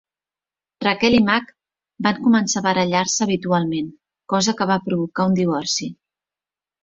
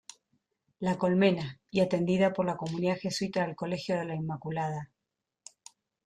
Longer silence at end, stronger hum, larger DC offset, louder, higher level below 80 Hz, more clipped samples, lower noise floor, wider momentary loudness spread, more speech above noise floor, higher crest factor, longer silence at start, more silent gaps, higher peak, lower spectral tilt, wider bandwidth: second, 0.9 s vs 1.2 s; neither; neither; first, -19 LUFS vs -30 LUFS; first, -54 dBFS vs -68 dBFS; neither; about the same, under -90 dBFS vs -87 dBFS; about the same, 8 LU vs 10 LU; first, over 71 dB vs 57 dB; about the same, 20 dB vs 18 dB; about the same, 0.8 s vs 0.8 s; neither; first, -2 dBFS vs -12 dBFS; second, -4 dB/octave vs -6.5 dB/octave; second, 7.8 kHz vs 12 kHz